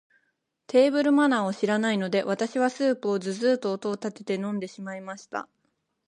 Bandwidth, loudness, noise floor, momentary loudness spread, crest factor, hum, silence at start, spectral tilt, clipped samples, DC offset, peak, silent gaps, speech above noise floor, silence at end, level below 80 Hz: 10.5 kHz; -25 LUFS; -75 dBFS; 15 LU; 18 dB; none; 0.7 s; -5.5 dB/octave; under 0.1%; under 0.1%; -8 dBFS; none; 50 dB; 0.65 s; -78 dBFS